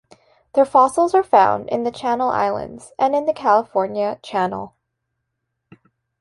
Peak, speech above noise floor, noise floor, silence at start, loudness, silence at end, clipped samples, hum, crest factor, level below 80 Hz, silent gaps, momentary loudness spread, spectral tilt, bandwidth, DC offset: -2 dBFS; 59 dB; -77 dBFS; 0.55 s; -18 LUFS; 1.5 s; under 0.1%; none; 18 dB; -58 dBFS; none; 10 LU; -5.5 dB/octave; 11.5 kHz; under 0.1%